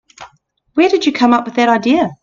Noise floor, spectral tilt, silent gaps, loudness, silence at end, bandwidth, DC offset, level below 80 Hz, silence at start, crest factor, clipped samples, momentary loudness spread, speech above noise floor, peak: -53 dBFS; -5 dB/octave; none; -13 LUFS; 0.1 s; 7.4 kHz; under 0.1%; -54 dBFS; 0.2 s; 14 dB; under 0.1%; 3 LU; 41 dB; 0 dBFS